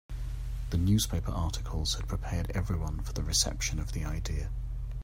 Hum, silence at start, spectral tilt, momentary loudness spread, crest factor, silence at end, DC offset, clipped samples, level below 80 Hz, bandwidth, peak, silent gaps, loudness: none; 0.1 s; -4 dB/octave; 11 LU; 20 dB; 0 s; under 0.1%; under 0.1%; -36 dBFS; 16 kHz; -12 dBFS; none; -32 LUFS